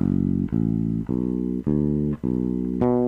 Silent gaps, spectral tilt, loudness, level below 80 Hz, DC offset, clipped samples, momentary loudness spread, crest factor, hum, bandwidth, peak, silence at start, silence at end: none; -12 dB/octave; -24 LUFS; -40 dBFS; under 0.1%; under 0.1%; 3 LU; 12 dB; none; 3.5 kHz; -10 dBFS; 0 s; 0 s